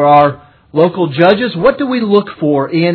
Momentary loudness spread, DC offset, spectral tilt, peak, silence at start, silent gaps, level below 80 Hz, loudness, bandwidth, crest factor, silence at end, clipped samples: 6 LU; under 0.1%; -9.5 dB/octave; 0 dBFS; 0 s; none; -46 dBFS; -12 LUFS; 5.4 kHz; 12 dB; 0 s; 0.2%